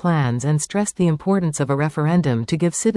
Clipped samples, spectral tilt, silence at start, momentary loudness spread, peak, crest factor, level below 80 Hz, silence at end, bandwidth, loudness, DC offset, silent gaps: under 0.1%; -6 dB/octave; 0.05 s; 2 LU; -8 dBFS; 12 dB; -52 dBFS; 0 s; 12 kHz; -20 LUFS; under 0.1%; none